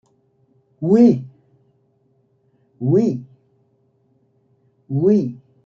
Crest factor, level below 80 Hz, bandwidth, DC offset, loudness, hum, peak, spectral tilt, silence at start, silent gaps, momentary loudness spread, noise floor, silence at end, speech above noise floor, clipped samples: 18 dB; -66 dBFS; 7.2 kHz; under 0.1%; -18 LUFS; none; -2 dBFS; -10 dB/octave; 0.8 s; none; 16 LU; -62 dBFS; 0.3 s; 47 dB; under 0.1%